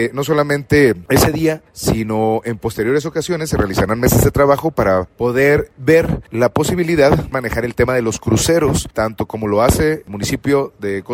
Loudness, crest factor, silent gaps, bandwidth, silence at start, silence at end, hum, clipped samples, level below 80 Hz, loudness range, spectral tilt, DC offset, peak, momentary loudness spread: -16 LUFS; 16 dB; none; 16.5 kHz; 0 s; 0 s; none; under 0.1%; -32 dBFS; 2 LU; -5.5 dB/octave; under 0.1%; 0 dBFS; 7 LU